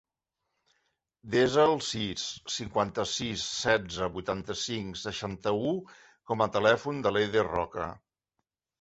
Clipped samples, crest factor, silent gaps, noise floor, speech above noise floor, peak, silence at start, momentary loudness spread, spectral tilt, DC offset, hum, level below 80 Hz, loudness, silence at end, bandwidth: under 0.1%; 22 dB; none; -85 dBFS; 56 dB; -8 dBFS; 1.25 s; 10 LU; -4 dB/octave; under 0.1%; none; -58 dBFS; -29 LUFS; 0.85 s; 8.2 kHz